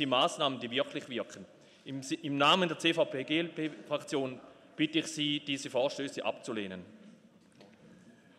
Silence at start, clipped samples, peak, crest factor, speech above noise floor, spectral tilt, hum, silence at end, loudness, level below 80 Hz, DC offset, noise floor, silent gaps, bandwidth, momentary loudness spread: 0 s; under 0.1%; -14 dBFS; 20 dB; 27 dB; -4 dB/octave; none; 0.25 s; -32 LUFS; -80 dBFS; under 0.1%; -60 dBFS; none; 14 kHz; 16 LU